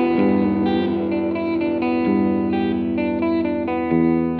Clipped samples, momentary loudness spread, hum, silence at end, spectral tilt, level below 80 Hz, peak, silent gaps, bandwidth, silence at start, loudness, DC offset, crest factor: under 0.1%; 4 LU; none; 0 s; -6.5 dB/octave; -48 dBFS; -6 dBFS; none; 4.8 kHz; 0 s; -20 LUFS; under 0.1%; 14 dB